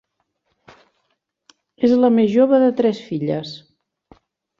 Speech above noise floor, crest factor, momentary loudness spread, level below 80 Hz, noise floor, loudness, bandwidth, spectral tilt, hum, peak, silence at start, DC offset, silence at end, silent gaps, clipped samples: 55 dB; 16 dB; 12 LU; -64 dBFS; -71 dBFS; -17 LUFS; 7.2 kHz; -8 dB/octave; none; -4 dBFS; 1.8 s; under 0.1%; 1 s; none; under 0.1%